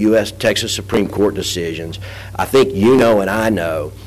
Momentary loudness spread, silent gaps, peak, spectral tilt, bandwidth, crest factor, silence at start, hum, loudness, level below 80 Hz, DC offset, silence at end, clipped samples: 13 LU; none; -6 dBFS; -5 dB/octave; 15.5 kHz; 10 dB; 0 s; none; -15 LUFS; -38 dBFS; under 0.1%; 0 s; under 0.1%